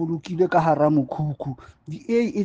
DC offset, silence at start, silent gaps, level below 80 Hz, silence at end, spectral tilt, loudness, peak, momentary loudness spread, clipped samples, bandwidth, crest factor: under 0.1%; 0 s; none; -56 dBFS; 0 s; -8.5 dB/octave; -22 LUFS; -6 dBFS; 18 LU; under 0.1%; 7.8 kHz; 16 dB